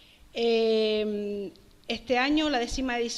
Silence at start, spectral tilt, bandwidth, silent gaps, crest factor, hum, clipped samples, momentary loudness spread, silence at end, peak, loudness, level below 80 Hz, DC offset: 0.35 s; -3.5 dB/octave; 12 kHz; none; 16 dB; none; under 0.1%; 14 LU; 0 s; -12 dBFS; -27 LUFS; -48 dBFS; under 0.1%